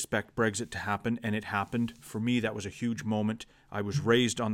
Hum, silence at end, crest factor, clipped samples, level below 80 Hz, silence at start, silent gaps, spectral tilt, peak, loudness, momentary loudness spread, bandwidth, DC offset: none; 0 s; 20 dB; under 0.1%; -60 dBFS; 0 s; none; -5 dB/octave; -12 dBFS; -31 LUFS; 9 LU; 16 kHz; under 0.1%